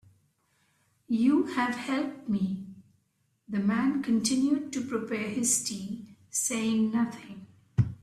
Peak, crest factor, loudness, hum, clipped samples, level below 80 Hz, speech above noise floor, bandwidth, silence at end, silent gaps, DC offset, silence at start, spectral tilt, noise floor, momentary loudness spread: -12 dBFS; 18 dB; -29 LUFS; none; under 0.1%; -60 dBFS; 45 dB; 14.5 kHz; 0.05 s; none; under 0.1%; 1.1 s; -4.5 dB/octave; -73 dBFS; 13 LU